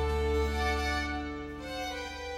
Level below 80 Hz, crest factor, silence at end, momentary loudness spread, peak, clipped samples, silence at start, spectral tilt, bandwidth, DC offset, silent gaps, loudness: -36 dBFS; 14 dB; 0 s; 9 LU; -18 dBFS; under 0.1%; 0 s; -5 dB/octave; 15 kHz; under 0.1%; none; -33 LUFS